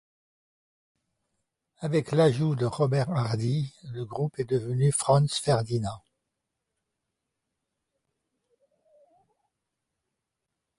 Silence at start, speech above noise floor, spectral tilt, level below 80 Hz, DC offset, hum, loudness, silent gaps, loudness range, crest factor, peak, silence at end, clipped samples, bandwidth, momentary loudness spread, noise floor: 1.8 s; 59 dB; -6 dB/octave; -60 dBFS; under 0.1%; none; -27 LUFS; none; 6 LU; 18 dB; -10 dBFS; 4.8 s; under 0.1%; 11.5 kHz; 13 LU; -84 dBFS